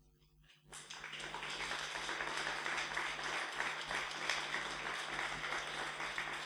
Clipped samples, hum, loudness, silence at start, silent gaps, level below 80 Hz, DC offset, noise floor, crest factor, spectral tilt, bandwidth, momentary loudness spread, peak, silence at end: under 0.1%; none; -40 LUFS; 0.4 s; none; -68 dBFS; under 0.1%; -68 dBFS; 26 dB; -1 dB/octave; over 20 kHz; 7 LU; -18 dBFS; 0 s